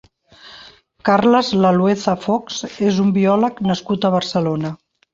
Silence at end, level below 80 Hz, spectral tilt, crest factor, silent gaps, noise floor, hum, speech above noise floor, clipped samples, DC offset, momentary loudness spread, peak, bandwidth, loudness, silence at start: 0.4 s; -56 dBFS; -6 dB/octave; 16 dB; none; -45 dBFS; none; 28 dB; under 0.1%; under 0.1%; 9 LU; -2 dBFS; 7.6 kHz; -17 LUFS; 0.45 s